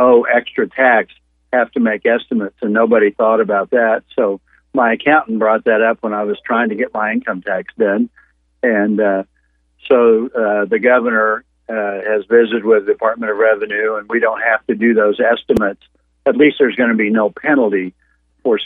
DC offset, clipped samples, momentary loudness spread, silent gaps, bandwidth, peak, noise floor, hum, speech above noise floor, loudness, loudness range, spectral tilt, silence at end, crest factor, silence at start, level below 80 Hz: under 0.1%; under 0.1%; 8 LU; none; 4 kHz; 0 dBFS; -59 dBFS; none; 44 dB; -15 LUFS; 3 LU; -7.5 dB/octave; 0 s; 14 dB; 0 s; -54 dBFS